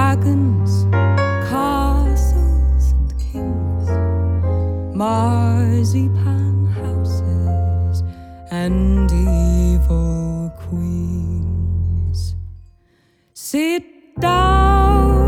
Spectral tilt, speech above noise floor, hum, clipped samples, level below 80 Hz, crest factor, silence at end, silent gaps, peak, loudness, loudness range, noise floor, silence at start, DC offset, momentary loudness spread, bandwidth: -7.5 dB/octave; 43 dB; none; under 0.1%; -20 dBFS; 14 dB; 0 s; none; -2 dBFS; -18 LUFS; 5 LU; -58 dBFS; 0 s; under 0.1%; 9 LU; 14.5 kHz